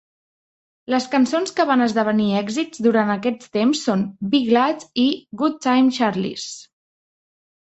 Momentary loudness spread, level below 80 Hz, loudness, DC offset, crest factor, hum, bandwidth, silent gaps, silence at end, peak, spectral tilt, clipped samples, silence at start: 6 LU; -64 dBFS; -20 LUFS; under 0.1%; 18 dB; none; 8.2 kHz; none; 1.1 s; -4 dBFS; -5 dB/octave; under 0.1%; 0.9 s